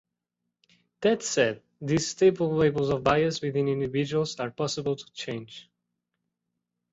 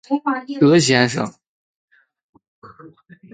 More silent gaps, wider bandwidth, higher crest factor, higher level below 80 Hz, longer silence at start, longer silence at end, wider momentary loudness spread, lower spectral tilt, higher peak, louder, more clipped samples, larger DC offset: second, none vs 1.48-1.88 s, 2.23-2.33 s, 2.48-2.62 s; second, 8.2 kHz vs 9.6 kHz; about the same, 20 dB vs 20 dB; about the same, -58 dBFS vs -62 dBFS; first, 1 s vs 0.1 s; first, 1.3 s vs 0.45 s; about the same, 12 LU vs 12 LU; about the same, -5 dB/octave vs -5 dB/octave; second, -8 dBFS vs -2 dBFS; second, -26 LUFS vs -17 LUFS; neither; neither